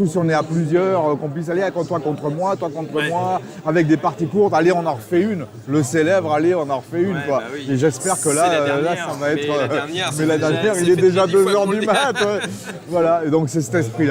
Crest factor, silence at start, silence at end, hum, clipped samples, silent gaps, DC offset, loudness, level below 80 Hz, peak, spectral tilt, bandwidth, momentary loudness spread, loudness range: 14 dB; 0 s; 0 s; none; under 0.1%; none; under 0.1%; -19 LUFS; -60 dBFS; -4 dBFS; -5.5 dB/octave; 16.5 kHz; 8 LU; 3 LU